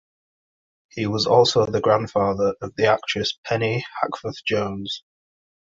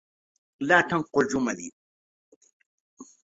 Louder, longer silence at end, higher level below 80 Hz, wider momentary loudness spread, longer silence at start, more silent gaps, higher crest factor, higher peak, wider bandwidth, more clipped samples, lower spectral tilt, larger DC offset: first, -22 LUFS vs -25 LUFS; first, 0.8 s vs 0.2 s; first, -54 dBFS vs -66 dBFS; second, 11 LU vs 15 LU; first, 0.95 s vs 0.6 s; second, 3.38-3.43 s vs 1.72-2.41 s, 2.53-2.60 s, 2.66-2.97 s; about the same, 20 dB vs 24 dB; about the same, -2 dBFS vs -4 dBFS; about the same, 7.8 kHz vs 8 kHz; neither; about the same, -5 dB/octave vs -4.5 dB/octave; neither